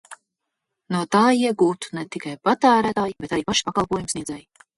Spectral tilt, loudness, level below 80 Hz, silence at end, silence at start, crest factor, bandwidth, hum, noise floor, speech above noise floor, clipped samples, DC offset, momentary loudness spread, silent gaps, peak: -4 dB/octave; -21 LUFS; -54 dBFS; 0.35 s; 0.1 s; 18 dB; 11.5 kHz; none; -81 dBFS; 60 dB; under 0.1%; under 0.1%; 13 LU; none; -4 dBFS